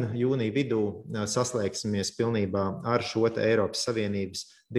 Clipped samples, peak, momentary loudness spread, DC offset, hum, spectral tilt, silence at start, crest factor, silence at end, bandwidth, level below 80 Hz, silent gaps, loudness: under 0.1%; -10 dBFS; 6 LU; under 0.1%; none; -5 dB/octave; 0 s; 16 dB; 0 s; 13 kHz; -64 dBFS; none; -28 LUFS